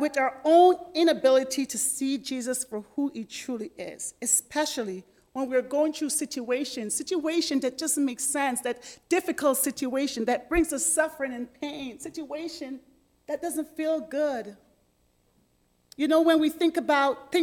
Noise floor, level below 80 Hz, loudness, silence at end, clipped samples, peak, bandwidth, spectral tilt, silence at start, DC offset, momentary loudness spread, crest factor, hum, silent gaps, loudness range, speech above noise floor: -68 dBFS; -56 dBFS; -26 LUFS; 0 s; under 0.1%; -8 dBFS; 18 kHz; -2 dB/octave; 0 s; under 0.1%; 14 LU; 18 dB; none; none; 7 LU; 41 dB